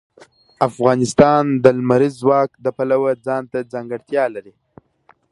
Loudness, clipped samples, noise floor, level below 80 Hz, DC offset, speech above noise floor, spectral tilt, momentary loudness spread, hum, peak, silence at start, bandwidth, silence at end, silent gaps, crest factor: -17 LUFS; under 0.1%; -56 dBFS; -54 dBFS; under 0.1%; 39 dB; -6.5 dB/octave; 12 LU; none; 0 dBFS; 0.6 s; 11.5 kHz; 0.9 s; none; 18 dB